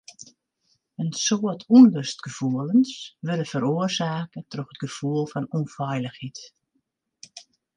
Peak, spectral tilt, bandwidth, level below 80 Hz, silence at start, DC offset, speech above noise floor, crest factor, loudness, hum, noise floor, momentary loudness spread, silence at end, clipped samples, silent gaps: -4 dBFS; -5.5 dB/octave; 9.6 kHz; -70 dBFS; 1 s; under 0.1%; 52 dB; 20 dB; -23 LUFS; none; -75 dBFS; 21 LU; 0.35 s; under 0.1%; none